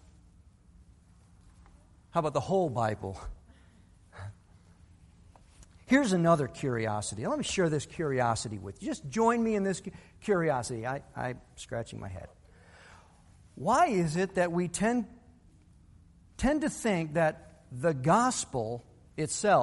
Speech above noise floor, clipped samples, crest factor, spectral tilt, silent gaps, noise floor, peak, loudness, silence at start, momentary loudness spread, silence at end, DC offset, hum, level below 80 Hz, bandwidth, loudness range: 29 dB; under 0.1%; 22 dB; -5.5 dB/octave; none; -59 dBFS; -10 dBFS; -30 LUFS; 2.15 s; 19 LU; 0 s; under 0.1%; none; -54 dBFS; 11.5 kHz; 6 LU